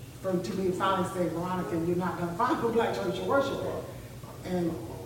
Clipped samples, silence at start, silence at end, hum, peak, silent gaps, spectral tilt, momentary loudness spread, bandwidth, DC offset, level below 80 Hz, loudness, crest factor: under 0.1%; 0 s; 0 s; none; -14 dBFS; none; -6.5 dB/octave; 9 LU; 17 kHz; under 0.1%; -54 dBFS; -30 LUFS; 16 dB